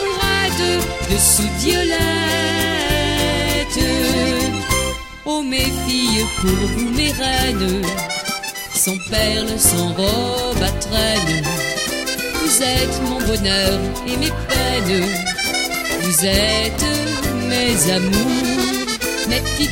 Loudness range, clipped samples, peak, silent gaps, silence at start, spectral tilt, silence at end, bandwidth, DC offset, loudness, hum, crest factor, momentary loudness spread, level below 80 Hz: 2 LU; under 0.1%; 0 dBFS; none; 0 s; -3 dB/octave; 0 s; 16.5 kHz; under 0.1%; -17 LUFS; none; 18 dB; 6 LU; -30 dBFS